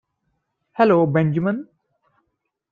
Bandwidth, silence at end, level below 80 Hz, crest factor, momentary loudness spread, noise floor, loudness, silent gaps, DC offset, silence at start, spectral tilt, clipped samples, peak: 5 kHz; 1.1 s; -64 dBFS; 18 dB; 13 LU; -75 dBFS; -19 LUFS; none; under 0.1%; 0.8 s; -10 dB/octave; under 0.1%; -4 dBFS